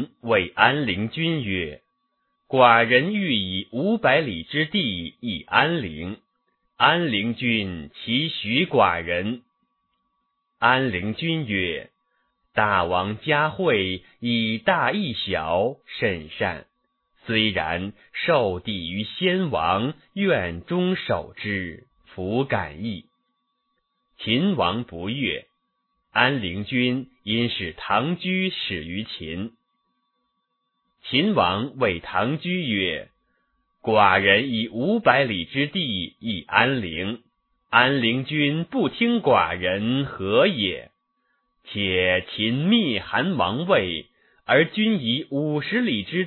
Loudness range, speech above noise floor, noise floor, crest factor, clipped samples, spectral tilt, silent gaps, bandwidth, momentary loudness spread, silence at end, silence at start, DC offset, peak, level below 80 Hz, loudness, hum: 6 LU; 52 dB; -75 dBFS; 24 dB; under 0.1%; -9 dB/octave; none; 4.4 kHz; 11 LU; 0 s; 0 s; under 0.1%; 0 dBFS; -54 dBFS; -22 LUFS; none